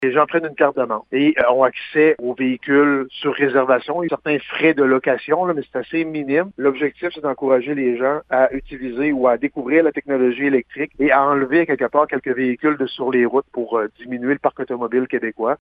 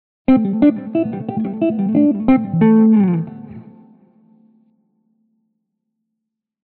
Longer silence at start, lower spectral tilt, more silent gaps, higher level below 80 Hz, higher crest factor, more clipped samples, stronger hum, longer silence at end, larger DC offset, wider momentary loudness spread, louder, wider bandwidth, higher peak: second, 0 s vs 0.3 s; about the same, -9 dB/octave vs -9.5 dB/octave; neither; second, -56 dBFS vs -50 dBFS; about the same, 18 dB vs 14 dB; neither; neither; second, 0.05 s vs 3.05 s; neither; second, 7 LU vs 11 LU; second, -19 LUFS vs -15 LUFS; first, 5 kHz vs 4.2 kHz; first, 0 dBFS vs -4 dBFS